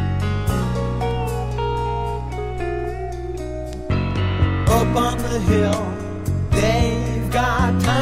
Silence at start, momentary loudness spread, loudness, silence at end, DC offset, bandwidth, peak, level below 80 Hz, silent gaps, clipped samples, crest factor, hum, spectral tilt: 0 s; 10 LU; -21 LUFS; 0 s; under 0.1%; 16 kHz; -4 dBFS; -28 dBFS; none; under 0.1%; 16 dB; none; -6 dB/octave